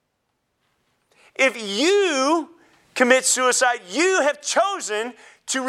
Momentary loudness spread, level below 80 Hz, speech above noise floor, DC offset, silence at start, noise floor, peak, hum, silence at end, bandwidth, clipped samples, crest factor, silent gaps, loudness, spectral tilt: 16 LU; -78 dBFS; 53 dB; under 0.1%; 1.4 s; -73 dBFS; -2 dBFS; none; 0 s; 15 kHz; under 0.1%; 20 dB; none; -19 LUFS; -1 dB/octave